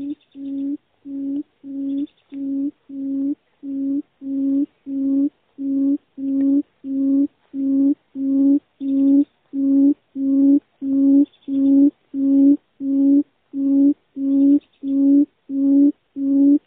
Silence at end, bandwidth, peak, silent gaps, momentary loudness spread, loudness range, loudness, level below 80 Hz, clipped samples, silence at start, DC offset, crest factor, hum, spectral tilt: 0.1 s; 1.2 kHz; -6 dBFS; none; 13 LU; 9 LU; -19 LUFS; -68 dBFS; under 0.1%; 0 s; under 0.1%; 12 dB; none; -9.5 dB/octave